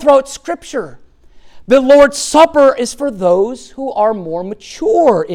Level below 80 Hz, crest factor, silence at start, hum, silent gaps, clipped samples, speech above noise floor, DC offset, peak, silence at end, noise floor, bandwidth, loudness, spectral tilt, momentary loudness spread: -44 dBFS; 12 dB; 0 s; none; none; under 0.1%; 28 dB; under 0.1%; 0 dBFS; 0 s; -40 dBFS; 13.5 kHz; -12 LUFS; -4 dB/octave; 15 LU